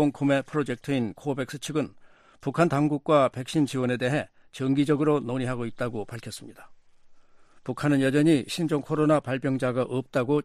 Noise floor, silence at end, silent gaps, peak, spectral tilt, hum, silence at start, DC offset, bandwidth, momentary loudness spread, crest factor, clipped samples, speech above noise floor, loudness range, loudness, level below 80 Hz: -52 dBFS; 0 s; none; -10 dBFS; -6.5 dB/octave; none; 0 s; under 0.1%; 14 kHz; 13 LU; 16 dB; under 0.1%; 27 dB; 4 LU; -26 LUFS; -60 dBFS